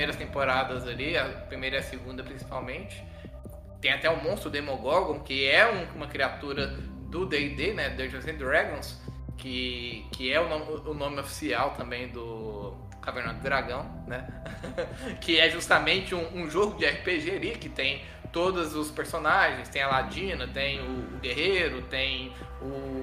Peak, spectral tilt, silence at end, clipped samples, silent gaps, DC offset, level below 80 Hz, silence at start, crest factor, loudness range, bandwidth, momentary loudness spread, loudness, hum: -4 dBFS; -4 dB/octave; 0 s; under 0.1%; none; under 0.1%; -44 dBFS; 0 s; 26 dB; 6 LU; 15.5 kHz; 15 LU; -28 LUFS; none